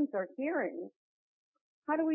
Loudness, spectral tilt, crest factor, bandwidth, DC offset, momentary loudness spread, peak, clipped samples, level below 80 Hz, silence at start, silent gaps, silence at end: -36 LUFS; -0.5 dB/octave; 16 dB; 3 kHz; under 0.1%; 13 LU; -20 dBFS; under 0.1%; -88 dBFS; 0 s; 0.96-1.54 s, 1.61-1.82 s; 0 s